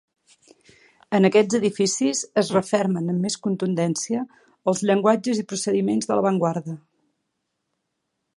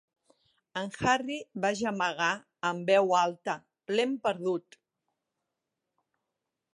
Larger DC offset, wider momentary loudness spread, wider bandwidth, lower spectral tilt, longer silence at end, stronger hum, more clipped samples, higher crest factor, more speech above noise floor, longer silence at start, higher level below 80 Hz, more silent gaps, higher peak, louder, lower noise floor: neither; about the same, 9 LU vs 11 LU; about the same, 11.5 kHz vs 11.5 kHz; about the same, -5 dB/octave vs -4 dB/octave; second, 1.6 s vs 2.15 s; neither; neither; about the same, 20 dB vs 20 dB; about the same, 56 dB vs 57 dB; first, 1.1 s vs 0.75 s; about the same, -70 dBFS vs -66 dBFS; neither; first, -4 dBFS vs -12 dBFS; first, -22 LUFS vs -30 LUFS; second, -78 dBFS vs -86 dBFS